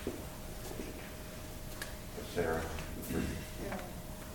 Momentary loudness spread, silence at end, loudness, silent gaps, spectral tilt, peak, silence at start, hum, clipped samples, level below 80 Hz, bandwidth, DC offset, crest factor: 10 LU; 0 s; -41 LUFS; none; -5 dB/octave; -22 dBFS; 0 s; none; under 0.1%; -48 dBFS; 17.5 kHz; under 0.1%; 20 dB